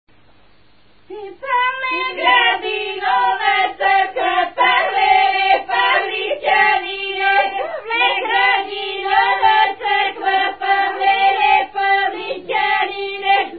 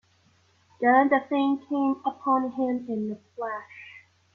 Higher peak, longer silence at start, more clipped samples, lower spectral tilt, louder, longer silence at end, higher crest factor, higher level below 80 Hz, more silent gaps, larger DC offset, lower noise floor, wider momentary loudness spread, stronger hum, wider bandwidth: first, -2 dBFS vs -8 dBFS; first, 1.1 s vs 0.8 s; neither; about the same, -6.5 dB/octave vs -7.5 dB/octave; first, -16 LUFS vs -26 LUFS; second, 0 s vs 0.35 s; about the same, 16 dB vs 18 dB; first, -58 dBFS vs -72 dBFS; neither; first, 0.4% vs under 0.1%; second, -54 dBFS vs -63 dBFS; second, 8 LU vs 16 LU; neither; about the same, 4.8 kHz vs 4.7 kHz